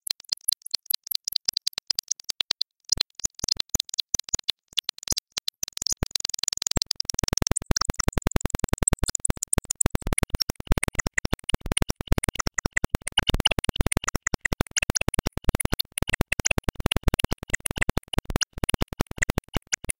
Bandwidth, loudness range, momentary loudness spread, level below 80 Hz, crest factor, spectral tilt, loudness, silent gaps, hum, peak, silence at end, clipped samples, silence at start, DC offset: 17 kHz; 1 LU; 5 LU; -34 dBFS; 24 dB; -2.5 dB/octave; -26 LUFS; 10.43-10.47 s; none; -4 dBFS; 0.1 s; under 0.1%; 0.1 s; 0.3%